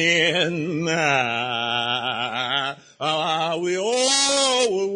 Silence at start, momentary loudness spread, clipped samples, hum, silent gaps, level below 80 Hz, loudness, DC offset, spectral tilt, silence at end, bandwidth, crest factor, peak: 0 s; 7 LU; under 0.1%; none; none; -66 dBFS; -21 LUFS; under 0.1%; -2.5 dB/octave; 0 s; 10.5 kHz; 18 dB; -4 dBFS